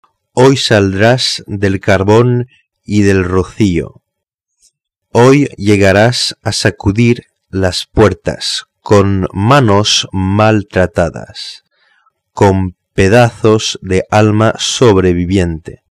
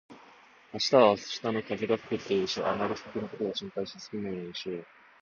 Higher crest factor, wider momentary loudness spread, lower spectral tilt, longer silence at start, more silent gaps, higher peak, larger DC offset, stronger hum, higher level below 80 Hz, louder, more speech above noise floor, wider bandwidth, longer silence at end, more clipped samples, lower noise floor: second, 12 dB vs 22 dB; second, 10 LU vs 15 LU; about the same, -5.5 dB/octave vs -4.5 dB/octave; first, 0.35 s vs 0.1 s; first, 4.34-4.38 s vs none; first, 0 dBFS vs -8 dBFS; neither; neither; first, -36 dBFS vs -66 dBFS; first, -11 LUFS vs -30 LUFS; first, 65 dB vs 27 dB; first, 13 kHz vs 7.4 kHz; second, 0.2 s vs 0.35 s; first, 0.1% vs under 0.1%; first, -75 dBFS vs -56 dBFS